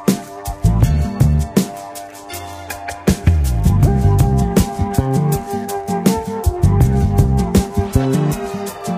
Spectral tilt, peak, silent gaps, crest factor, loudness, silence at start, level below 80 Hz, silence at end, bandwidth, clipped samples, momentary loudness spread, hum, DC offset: -7 dB/octave; -2 dBFS; none; 14 dB; -16 LUFS; 0 s; -22 dBFS; 0 s; 16 kHz; under 0.1%; 14 LU; none; under 0.1%